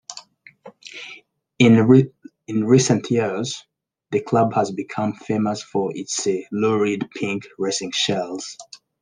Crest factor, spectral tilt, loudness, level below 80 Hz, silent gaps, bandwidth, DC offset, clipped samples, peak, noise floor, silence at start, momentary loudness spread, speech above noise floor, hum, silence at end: 20 dB; -5 dB/octave; -20 LUFS; -66 dBFS; none; 10 kHz; under 0.1%; under 0.1%; -2 dBFS; -46 dBFS; 0.1 s; 19 LU; 27 dB; none; 0.25 s